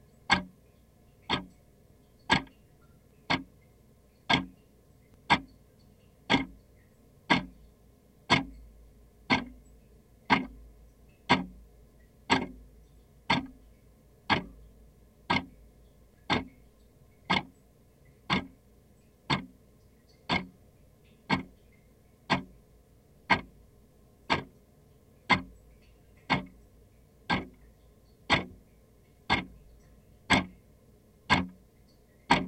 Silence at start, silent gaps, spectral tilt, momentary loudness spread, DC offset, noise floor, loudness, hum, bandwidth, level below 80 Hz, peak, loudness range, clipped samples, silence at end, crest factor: 0.3 s; none; -4.5 dB/octave; 23 LU; under 0.1%; -61 dBFS; -30 LUFS; none; 16 kHz; -56 dBFS; -8 dBFS; 4 LU; under 0.1%; 0 s; 28 dB